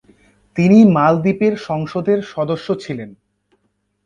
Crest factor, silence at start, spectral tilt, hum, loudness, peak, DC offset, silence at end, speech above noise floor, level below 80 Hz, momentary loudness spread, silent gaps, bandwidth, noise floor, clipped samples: 16 dB; 0.55 s; -8.5 dB/octave; none; -15 LUFS; 0 dBFS; under 0.1%; 0.95 s; 52 dB; -54 dBFS; 18 LU; none; 7.2 kHz; -67 dBFS; under 0.1%